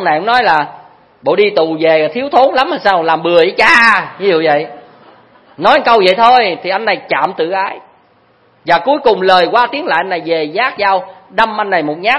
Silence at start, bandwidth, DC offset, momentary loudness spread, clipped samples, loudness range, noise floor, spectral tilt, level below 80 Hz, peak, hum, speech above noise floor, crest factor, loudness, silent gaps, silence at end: 0 s; 11 kHz; under 0.1%; 8 LU; 0.3%; 3 LU; -50 dBFS; -4.5 dB/octave; -52 dBFS; 0 dBFS; none; 39 dB; 12 dB; -11 LUFS; none; 0 s